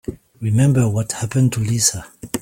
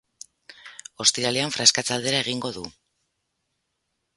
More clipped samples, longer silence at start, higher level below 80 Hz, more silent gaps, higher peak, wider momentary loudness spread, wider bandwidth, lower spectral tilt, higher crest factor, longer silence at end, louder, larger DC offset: neither; second, 0.1 s vs 0.5 s; first, -46 dBFS vs -64 dBFS; neither; about the same, -2 dBFS vs 0 dBFS; second, 13 LU vs 23 LU; first, 16.5 kHz vs 11.5 kHz; first, -5 dB/octave vs -1.5 dB/octave; second, 16 dB vs 26 dB; second, 0 s vs 1.45 s; first, -18 LUFS vs -21 LUFS; neither